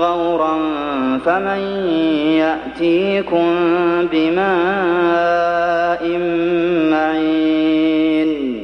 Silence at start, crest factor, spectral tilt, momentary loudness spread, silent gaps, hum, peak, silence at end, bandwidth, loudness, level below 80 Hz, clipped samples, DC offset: 0 s; 12 dB; -7 dB/octave; 4 LU; none; none; -4 dBFS; 0 s; 6.2 kHz; -16 LUFS; -50 dBFS; under 0.1%; under 0.1%